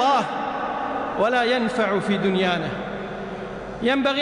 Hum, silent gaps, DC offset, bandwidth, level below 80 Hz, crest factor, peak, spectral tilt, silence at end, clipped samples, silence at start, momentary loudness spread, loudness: none; none; under 0.1%; 10.5 kHz; -52 dBFS; 12 dB; -10 dBFS; -5.5 dB/octave; 0 s; under 0.1%; 0 s; 11 LU; -23 LUFS